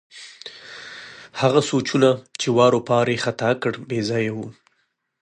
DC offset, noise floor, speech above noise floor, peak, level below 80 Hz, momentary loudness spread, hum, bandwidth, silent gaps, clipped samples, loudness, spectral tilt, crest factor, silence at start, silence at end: under 0.1%; -70 dBFS; 50 dB; -2 dBFS; -64 dBFS; 20 LU; none; 10.5 kHz; none; under 0.1%; -20 LUFS; -5 dB/octave; 20 dB; 0.15 s; 0.7 s